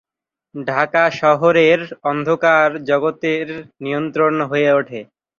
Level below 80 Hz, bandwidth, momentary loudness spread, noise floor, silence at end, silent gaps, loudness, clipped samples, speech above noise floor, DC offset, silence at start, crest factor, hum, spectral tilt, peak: -62 dBFS; 7.2 kHz; 15 LU; -79 dBFS; 0.35 s; none; -16 LUFS; under 0.1%; 63 dB; under 0.1%; 0.55 s; 16 dB; none; -6 dB/octave; -2 dBFS